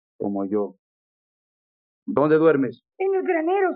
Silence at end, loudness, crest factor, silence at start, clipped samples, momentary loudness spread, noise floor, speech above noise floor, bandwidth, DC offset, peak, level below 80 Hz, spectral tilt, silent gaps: 0 s; -22 LUFS; 18 dB; 0.2 s; under 0.1%; 12 LU; under -90 dBFS; over 69 dB; 4.7 kHz; under 0.1%; -6 dBFS; -70 dBFS; -6.5 dB/octave; 0.79-2.06 s